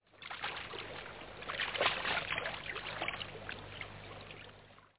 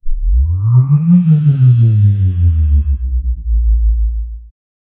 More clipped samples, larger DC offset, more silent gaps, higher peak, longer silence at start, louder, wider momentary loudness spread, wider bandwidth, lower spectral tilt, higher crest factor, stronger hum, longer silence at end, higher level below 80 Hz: neither; neither; neither; second, -16 dBFS vs -2 dBFS; about the same, 0.05 s vs 0.05 s; second, -39 LUFS vs -12 LUFS; first, 17 LU vs 9 LU; first, 4 kHz vs 3.4 kHz; second, -0.5 dB/octave vs -15 dB/octave; first, 24 dB vs 10 dB; first, 50 Hz at -60 dBFS vs none; second, 0 s vs 0.5 s; second, -62 dBFS vs -16 dBFS